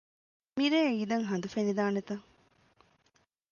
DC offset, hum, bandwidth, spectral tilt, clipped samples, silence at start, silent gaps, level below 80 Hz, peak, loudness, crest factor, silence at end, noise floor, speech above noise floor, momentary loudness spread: under 0.1%; none; 7.2 kHz; -5.5 dB/octave; under 0.1%; 0.55 s; none; -74 dBFS; -16 dBFS; -31 LUFS; 16 dB; 1.3 s; -72 dBFS; 42 dB; 14 LU